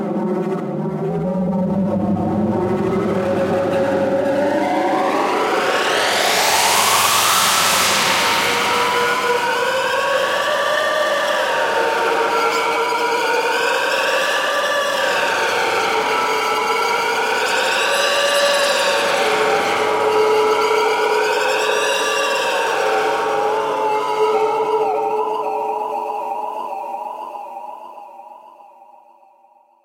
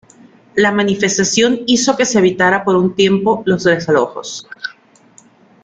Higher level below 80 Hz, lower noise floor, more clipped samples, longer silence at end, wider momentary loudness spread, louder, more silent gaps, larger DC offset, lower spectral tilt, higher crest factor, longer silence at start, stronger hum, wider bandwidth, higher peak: about the same, -58 dBFS vs -54 dBFS; first, -53 dBFS vs -48 dBFS; neither; first, 1.35 s vs 0.95 s; second, 8 LU vs 14 LU; second, -17 LUFS vs -14 LUFS; neither; neither; second, -2.5 dB/octave vs -4 dB/octave; about the same, 16 dB vs 14 dB; second, 0 s vs 0.55 s; neither; first, 16.5 kHz vs 9.4 kHz; about the same, -2 dBFS vs -2 dBFS